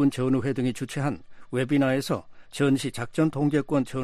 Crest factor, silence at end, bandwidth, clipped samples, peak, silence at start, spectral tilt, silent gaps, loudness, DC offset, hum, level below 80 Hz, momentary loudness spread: 14 dB; 0 s; 14 kHz; under 0.1%; -12 dBFS; 0 s; -6.5 dB/octave; none; -26 LUFS; under 0.1%; none; -56 dBFS; 8 LU